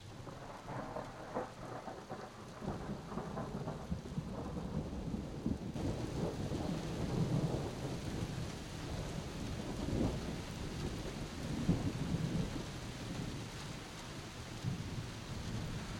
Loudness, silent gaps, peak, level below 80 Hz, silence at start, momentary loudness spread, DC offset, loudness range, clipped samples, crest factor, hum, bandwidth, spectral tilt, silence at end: -42 LUFS; none; -20 dBFS; -50 dBFS; 0 s; 9 LU; under 0.1%; 5 LU; under 0.1%; 22 dB; none; 16 kHz; -6 dB/octave; 0 s